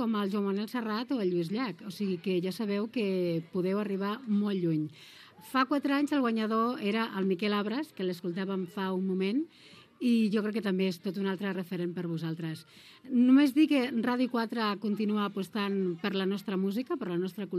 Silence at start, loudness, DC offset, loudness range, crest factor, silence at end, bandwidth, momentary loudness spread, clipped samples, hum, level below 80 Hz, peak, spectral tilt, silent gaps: 0 s; -31 LUFS; under 0.1%; 4 LU; 18 dB; 0 s; 14.5 kHz; 7 LU; under 0.1%; none; -86 dBFS; -12 dBFS; -7 dB/octave; none